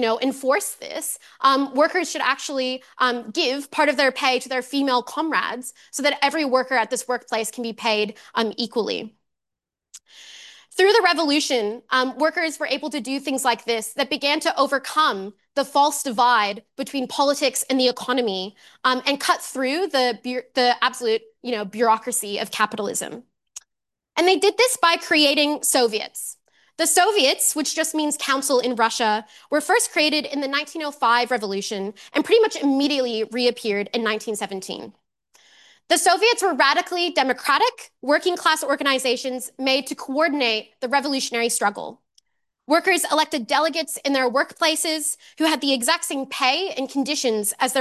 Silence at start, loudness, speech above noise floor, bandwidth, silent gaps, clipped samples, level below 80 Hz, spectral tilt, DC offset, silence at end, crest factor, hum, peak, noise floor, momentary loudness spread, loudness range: 0 s; -21 LUFS; 64 dB; 13 kHz; none; under 0.1%; -76 dBFS; -1.5 dB/octave; under 0.1%; 0 s; 18 dB; none; -4 dBFS; -85 dBFS; 10 LU; 3 LU